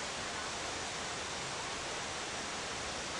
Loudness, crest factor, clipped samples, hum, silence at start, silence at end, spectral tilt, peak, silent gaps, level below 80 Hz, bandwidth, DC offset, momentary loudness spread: -38 LUFS; 14 dB; under 0.1%; none; 0 s; 0 s; -1.5 dB/octave; -26 dBFS; none; -60 dBFS; 11.5 kHz; under 0.1%; 0 LU